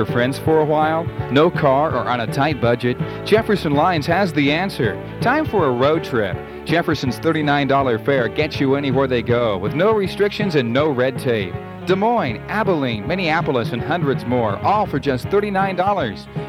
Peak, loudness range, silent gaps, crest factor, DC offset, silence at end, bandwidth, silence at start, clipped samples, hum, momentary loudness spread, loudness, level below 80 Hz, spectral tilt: -2 dBFS; 2 LU; none; 16 dB; under 0.1%; 0 s; 16 kHz; 0 s; under 0.1%; none; 5 LU; -19 LUFS; -44 dBFS; -7 dB/octave